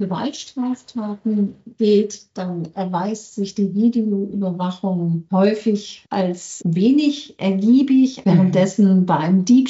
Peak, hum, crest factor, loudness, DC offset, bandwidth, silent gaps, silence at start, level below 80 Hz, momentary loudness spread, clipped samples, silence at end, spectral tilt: -4 dBFS; none; 14 dB; -19 LUFS; under 0.1%; 8 kHz; none; 0 s; -66 dBFS; 11 LU; under 0.1%; 0 s; -7.5 dB/octave